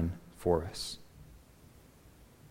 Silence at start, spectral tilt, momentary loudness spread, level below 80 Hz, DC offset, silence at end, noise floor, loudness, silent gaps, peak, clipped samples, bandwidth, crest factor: 0 s; -5.5 dB/octave; 25 LU; -54 dBFS; under 0.1%; 0 s; -58 dBFS; -35 LUFS; none; -14 dBFS; under 0.1%; 16 kHz; 24 dB